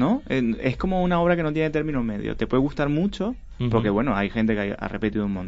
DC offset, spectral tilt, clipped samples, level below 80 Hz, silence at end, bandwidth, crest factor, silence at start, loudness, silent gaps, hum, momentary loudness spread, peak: under 0.1%; -8.5 dB/octave; under 0.1%; -38 dBFS; 0 s; 7.8 kHz; 16 dB; 0 s; -24 LUFS; none; none; 7 LU; -6 dBFS